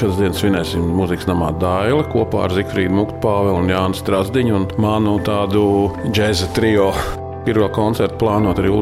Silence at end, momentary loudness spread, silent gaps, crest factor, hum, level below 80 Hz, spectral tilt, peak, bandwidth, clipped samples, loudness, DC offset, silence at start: 0 s; 3 LU; none; 12 dB; none; -36 dBFS; -6.5 dB/octave; -4 dBFS; 15.5 kHz; under 0.1%; -17 LUFS; 0.1%; 0 s